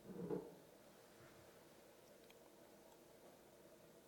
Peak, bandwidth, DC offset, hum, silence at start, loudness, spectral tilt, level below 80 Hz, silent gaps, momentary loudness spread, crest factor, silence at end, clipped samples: -34 dBFS; 19 kHz; under 0.1%; none; 0 s; -58 LUFS; -6 dB/octave; -84 dBFS; none; 16 LU; 24 dB; 0 s; under 0.1%